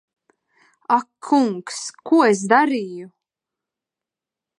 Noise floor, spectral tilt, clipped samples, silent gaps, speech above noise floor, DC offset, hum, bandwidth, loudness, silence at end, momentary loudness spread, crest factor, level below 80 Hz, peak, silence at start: -88 dBFS; -4.5 dB/octave; under 0.1%; none; 69 dB; under 0.1%; none; 11.5 kHz; -19 LUFS; 1.5 s; 16 LU; 20 dB; -80 dBFS; -2 dBFS; 0.9 s